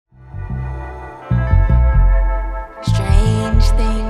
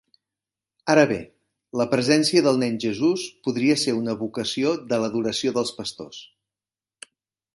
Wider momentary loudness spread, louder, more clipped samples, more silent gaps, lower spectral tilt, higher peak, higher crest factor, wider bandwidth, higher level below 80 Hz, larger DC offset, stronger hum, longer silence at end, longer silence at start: about the same, 15 LU vs 14 LU; first, -17 LUFS vs -23 LUFS; neither; neither; first, -7 dB/octave vs -4.5 dB/octave; about the same, -2 dBFS vs -4 dBFS; second, 12 dB vs 20 dB; about the same, 11 kHz vs 11.5 kHz; first, -16 dBFS vs -64 dBFS; neither; neither; second, 0 s vs 1.3 s; second, 0.3 s vs 0.85 s